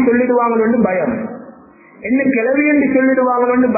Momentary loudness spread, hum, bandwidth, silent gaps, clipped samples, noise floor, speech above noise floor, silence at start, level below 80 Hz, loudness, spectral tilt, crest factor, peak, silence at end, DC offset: 11 LU; none; 2.7 kHz; none; under 0.1%; -42 dBFS; 29 dB; 0 s; -52 dBFS; -14 LUFS; -15.5 dB/octave; 12 dB; -2 dBFS; 0 s; under 0.1%